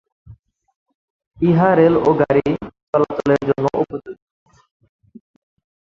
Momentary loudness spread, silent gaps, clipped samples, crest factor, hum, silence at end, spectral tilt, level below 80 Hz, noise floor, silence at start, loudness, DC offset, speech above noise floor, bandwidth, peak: 12 LU; 0.76-0.86 s, 0.95-1.19 s, 1.27-1.31 s, 2.83-2.93 s; under 0.1%; 18 dB; none; 1.7 s; -9 dB/octave; -50 dBFS; -46 dBFS; 0.3 s; -17 LUFS; under 0.1%; 30 dB; 7.4 kHz; -2 dBFS